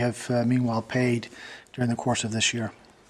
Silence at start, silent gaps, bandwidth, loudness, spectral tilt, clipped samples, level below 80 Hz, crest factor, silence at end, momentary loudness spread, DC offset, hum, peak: 0 s; none; 13 kHz; -26 LUFS; -4.5 dB/octave; under 0.1%; -58 dBFS; 16 dB; 0.35 s; 14 LU; under 0.1%; none; -10 dBFS